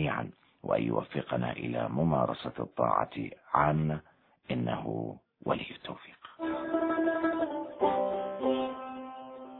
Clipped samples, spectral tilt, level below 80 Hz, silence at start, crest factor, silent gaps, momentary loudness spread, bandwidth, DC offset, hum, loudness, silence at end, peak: under 0.1%; -10.5 dB/octave; -60 dBFS; 0 s; 22 dB; none; 14 LU; 4.5 kHz; under 0.1%; none; -32 LUFS; 0 s; -10 dBFS